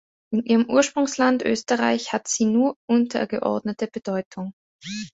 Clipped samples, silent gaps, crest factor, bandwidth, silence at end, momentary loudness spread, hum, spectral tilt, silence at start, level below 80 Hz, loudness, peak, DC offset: under 0.1%; 2.76-2.88 s, 4.25-4.31 s, 4.53-4.79 s; 18 dB; 8 kHz; 0.05 s; 14 LU; none; -4 dB/octave; 0.3 s; -64 dBFS; -22 LUFS; -4 dBFS; under 0.1%